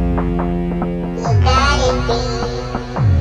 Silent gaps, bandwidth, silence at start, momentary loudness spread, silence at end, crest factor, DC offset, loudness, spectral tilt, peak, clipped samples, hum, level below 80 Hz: none; 9.6 kHz; 0 s; 9 LU; 0 s; 14 dB; under 0.1%; -17 LUFS; -6 dB/octave; -2 dBFS; under 0.1%; none; -22 dBFS